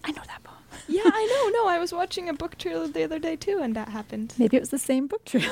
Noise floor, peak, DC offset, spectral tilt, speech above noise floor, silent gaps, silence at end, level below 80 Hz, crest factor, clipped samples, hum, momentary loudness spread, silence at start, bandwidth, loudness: -46 dBFS; -6 dBFS; under 0.1%; -4.5 dB/octave; 20 dB; none; 0 s; -56 dBFS; 20 dB; under 0.1%; none; 12 LU; 0.05 s; 16.5 kHz; -26 LUFS